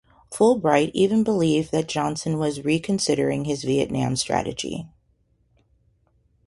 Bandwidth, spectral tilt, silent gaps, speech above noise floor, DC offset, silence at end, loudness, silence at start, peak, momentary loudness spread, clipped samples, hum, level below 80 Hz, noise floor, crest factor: 11.5 kHz; -5 dB/octave; none; 43 dB; under 0.1%; 1.6 s; -22 LUFS; 0.3 s; -4 dBFS; 7 LU; under 0.1%; none; -54 dBFS; -65 dBFS; 20 dB